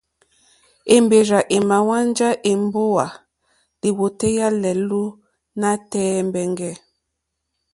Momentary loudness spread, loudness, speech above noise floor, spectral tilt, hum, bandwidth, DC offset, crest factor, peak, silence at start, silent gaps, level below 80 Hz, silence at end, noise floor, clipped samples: 13 LU; -19 LUFS; 59 dB; -5 dB/octave; none; 11.5 kHz; under 0.1%; 20 dB; 0 dBFS; 0.85 s; none; -56 dBFS; 0.95 s; -77 dBFS; under 0.1%